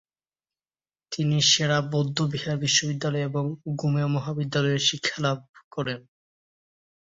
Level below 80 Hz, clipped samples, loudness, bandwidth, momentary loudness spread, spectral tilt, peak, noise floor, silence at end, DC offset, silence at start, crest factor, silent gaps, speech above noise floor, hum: -62 dBFS; under 0.1%; -25 LUFS; 7.8 kHz; 12 LU; -4 dB/octave; -6 dBFS; under -90 dBFS; 1.1 s; under 0.1%; 1.1 s; 20 dB; 5.49-5.54 s, 5.64-5.71 s; over 65 dB; none